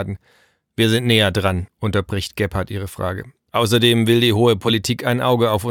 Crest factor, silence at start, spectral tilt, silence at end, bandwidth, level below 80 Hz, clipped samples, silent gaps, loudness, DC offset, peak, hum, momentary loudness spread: 16 dB; 0 s; -5.5 dB/octave; 0 s; 17.5 kHz; -44 dBFS; under 0.1%; none; -18 LUFS; under 0.1%; -2 dBFS; none; 12 LU